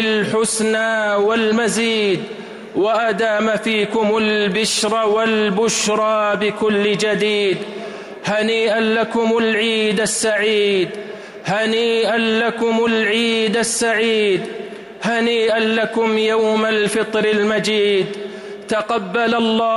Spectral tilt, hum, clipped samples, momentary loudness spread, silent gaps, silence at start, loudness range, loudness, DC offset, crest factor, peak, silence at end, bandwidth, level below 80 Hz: -3.5 dB/octave; none; under 0.1%; 8 LU; none; 0 s; 1 LU; -17 LUFS; under 0.1%; 10 dB; -8 dBFS; 0 s; 15 kHz; -58 dBFS